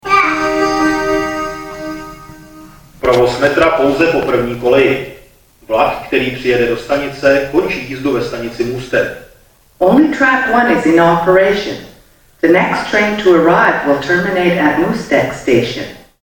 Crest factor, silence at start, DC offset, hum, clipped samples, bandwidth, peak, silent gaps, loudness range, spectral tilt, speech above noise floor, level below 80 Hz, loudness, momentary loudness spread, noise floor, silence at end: 12 dB; 0.05 s; under 0.1%; none; under 0.1%; 18 kHz; 0 dBFS; none; 4 LU; -5.5 dB/octave; 34 dB; -40 dBFS; -13 LUFS; 11 LU; -47 dBFS; 0.25 s